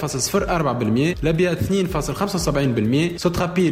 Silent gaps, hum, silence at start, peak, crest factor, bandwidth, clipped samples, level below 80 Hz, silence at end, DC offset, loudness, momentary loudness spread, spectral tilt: none; none; 0 s; -8 dBFS; 12 dB; 16 kHz; under 0.1%; -36 dBFS; 0 s; under 0.1%; -20 LUFS; 2 LU; -5.5 dB/octave